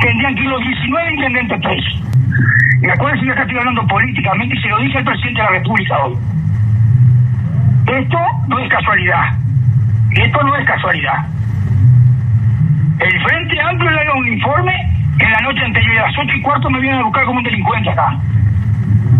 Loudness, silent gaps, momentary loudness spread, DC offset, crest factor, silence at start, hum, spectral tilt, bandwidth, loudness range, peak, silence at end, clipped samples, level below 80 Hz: -13 LUFS; none; 5 LU; under 0.1%; 12 dB; 0 s; none; -8.5 dB/octave; 4.1 kHz; 1 LU; 0 dBFS; 0 s; under 0.1%; -34 dBFS